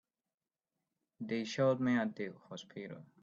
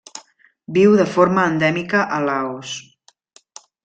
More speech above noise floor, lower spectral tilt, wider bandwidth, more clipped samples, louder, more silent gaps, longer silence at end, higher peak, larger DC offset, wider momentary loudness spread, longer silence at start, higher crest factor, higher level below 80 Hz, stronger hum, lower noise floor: first, over 54 dB vs 32 dB; about the same, -6 dB/octave vs -5.5 dB/octave; second, 7.8 kHz vs 9 kHz; neither; second, -35 LUFS vs -17 LUFS; neither; second, 0.15 s vs 1.05 s; second, -20 dBFS vs -2 dBFS; neither; about the same, 17 LU vs 17 LU; first, 1.2 s vs 0.15 s; about the same, 18 dB vs 16 dB; second, -80 dBFS vs -60 dBFS; neither; first, under -90 dBFS vs -49 dBFS